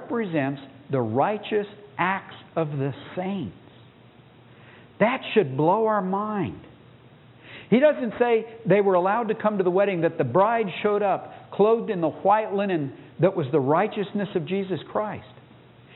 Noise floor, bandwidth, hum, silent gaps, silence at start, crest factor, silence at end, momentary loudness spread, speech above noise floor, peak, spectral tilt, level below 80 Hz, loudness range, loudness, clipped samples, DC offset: -51 dBFS; 4.1 kHz; none; none; 0 s; 18 dB; 0.7 s; 11 LU; 28 dB; -6 dBFS; -11.5 dB/octave; -68 dBFS; 6 LU; -24 LUFS; under 0.1%; under 0.1%